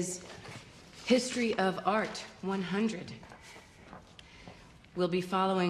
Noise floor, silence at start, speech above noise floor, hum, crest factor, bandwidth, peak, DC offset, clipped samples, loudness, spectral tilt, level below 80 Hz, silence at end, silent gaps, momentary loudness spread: -54 dBFS; 0 s; 22 dB; none; 22 dB; 13.5 kHz; -12 dBFS; under 0.1%; under 0.1%; -32 LUFS; -4.5 dB/octave; -64 dBFS; 0 s; none; 22 LU